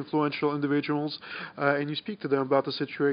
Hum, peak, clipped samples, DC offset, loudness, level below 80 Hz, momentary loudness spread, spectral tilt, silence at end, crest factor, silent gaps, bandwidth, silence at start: none; -8 dBFS; under 0.1%; under 0.1%; -28 LUFS; -76 dBFS; 8 LU; -4.5 dB/octave; 0 s; 20 dB; none; 5.4 kHz; 0 s